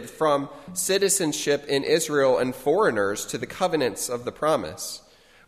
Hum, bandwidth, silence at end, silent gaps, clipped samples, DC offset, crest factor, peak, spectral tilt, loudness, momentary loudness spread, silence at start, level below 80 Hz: none; 15 kHz; 0.5 s; none; under 0.1%; under 0.1%; 18 dB; -8 dBFS; -3 dB/octave; -24 LUFS; 10 LU; 0 s; -58 dBFS